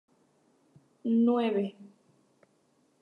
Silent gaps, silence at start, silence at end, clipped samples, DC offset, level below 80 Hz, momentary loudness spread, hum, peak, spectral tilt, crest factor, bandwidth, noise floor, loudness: none; 1.05 s; 1.15 s; under 0.1%; under 0.1%; -90 dBFS; 13 LU; none; -16 dBFS; -8.5 dB/octave; 16 dB; 4.3 kHz; -69 dBFS; -29 LUFS